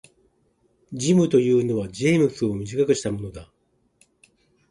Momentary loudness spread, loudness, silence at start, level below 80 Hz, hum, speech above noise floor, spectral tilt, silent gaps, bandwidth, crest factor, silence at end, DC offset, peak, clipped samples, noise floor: 16 LU; -22 LUFS; 0.9 s; -54 dBFS; none; 44 dB; -6 dB/octave; none; 11.5 kHz; 18 dB; 1.25 s; under 0.1%; -6 dBFS; under 0.1%; -65 dBFS